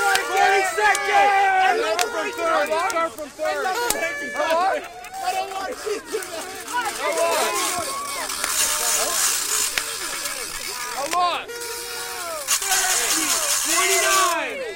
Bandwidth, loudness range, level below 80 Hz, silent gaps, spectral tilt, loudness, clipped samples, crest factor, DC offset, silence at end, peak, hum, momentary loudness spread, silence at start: 17 kHz; 5 LU; -54 dBFS; none; 0.5 dB/octave; -21 LUFS; under 0.1%; 20 dB; under 0.1%; 0 s; -2 dBFS; none; 11 LU; 0 s